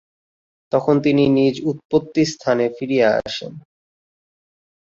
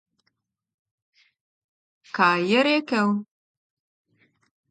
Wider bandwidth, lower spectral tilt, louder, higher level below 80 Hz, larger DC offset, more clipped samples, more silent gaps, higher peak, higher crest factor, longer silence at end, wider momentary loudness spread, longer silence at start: second, 7.8 kHz vs 9.2 kHz; about the same, -6 dB/octave vs -5.5 dB/octave; first, -18 LUFS vs -21 LUFS; first, -56 dBFS vs -78 dBFS; neither; neither; first, 1.85-1.89 s vs none; first, -2 dBFS vs -6 dBFS; about the same, 18 dB vs 22 dB; second, 1.3 s vs 1.5 s; about the same, 10 LU vs 9 LU; second, 0.75 s vs 2.15 s